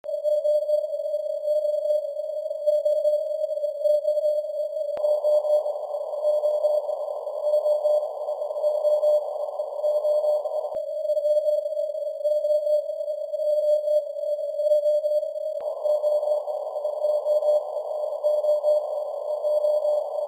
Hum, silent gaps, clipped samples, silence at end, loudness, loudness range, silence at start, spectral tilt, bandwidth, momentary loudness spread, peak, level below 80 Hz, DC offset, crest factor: none; none; under 0.1%; 0 s; -25 LUFS; 1 LU; 0.05 s; -1.5 dB/octave; 16 kHz; 8 LU; -12 dBFS; -84 dBFS; under 0.1%; 12 dB